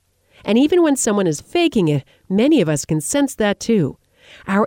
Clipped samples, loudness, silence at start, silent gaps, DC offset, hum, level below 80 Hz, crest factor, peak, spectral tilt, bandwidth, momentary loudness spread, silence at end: under 0.1%; -17 LUFS; 0.45 s; none; under 0.1%; none; -52 dBFS; 14 dB; -4 dBFS; -5 dB/octave; 17.5 kHz; 8 LU; 0 s